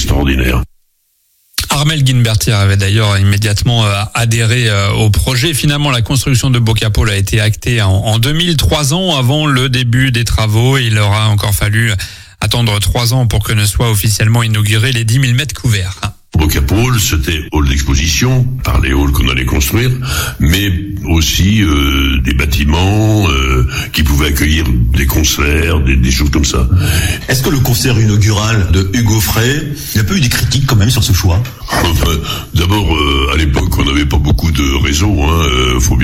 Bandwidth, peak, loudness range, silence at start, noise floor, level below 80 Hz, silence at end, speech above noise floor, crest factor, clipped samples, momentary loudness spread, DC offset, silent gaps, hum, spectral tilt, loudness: 16.5 kHz; 0 dBFS; 1 LU; 0 s; -58 dBFS; -18 dBFS; 0 s; 47 dB; 10 dB; under 0.1%; 4 LU; under 0.1%; none; none; -4.5 dB/octave; -12 LUFS